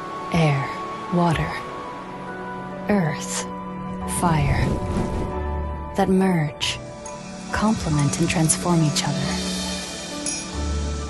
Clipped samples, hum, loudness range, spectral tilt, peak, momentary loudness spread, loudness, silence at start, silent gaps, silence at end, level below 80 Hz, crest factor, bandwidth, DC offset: under 0.1%; none; 4 LU; -5 dB/octave; -4 dBFS; 13 LU; -23 LUFS; 0 s; none; 0 s; -36 dBFS; 20 dB; 12.5 kHz; under 0.1%